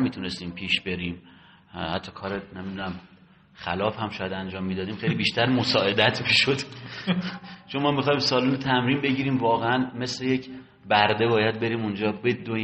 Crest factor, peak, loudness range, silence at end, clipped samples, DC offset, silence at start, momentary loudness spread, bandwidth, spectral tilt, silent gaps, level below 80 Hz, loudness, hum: 22 dB; -4 dBFS; 8 LU; 0 s; under 0.1%; under 0.1%; 0 s; 13 LU; 8.4 kHz; -5.5 dB/octave; none; -60 dBFS; -25 LUFS; none